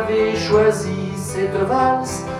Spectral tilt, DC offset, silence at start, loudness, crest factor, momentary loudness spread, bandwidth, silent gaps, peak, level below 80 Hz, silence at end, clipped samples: -5 dB/octave; under 0.1%; 0 s; -19 LUFS; 16 dB; 9 LU; 14 kHz; none; -4 dBFS; -46 dBFS; 0 s; under 0.1%